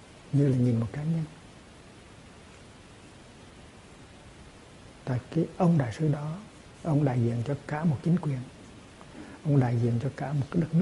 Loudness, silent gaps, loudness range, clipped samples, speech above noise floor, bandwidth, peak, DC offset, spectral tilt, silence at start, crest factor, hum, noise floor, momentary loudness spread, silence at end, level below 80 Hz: -28 LUFS; none; 20 LU; under 0.1%; 24 dB; 11.5 kHz; -10 dBFS; under 0.1%; -8.5 dB/octave; 0 s; 18 dB; none; -50 dBFS; 25 LU; 0 s; -56 dBFS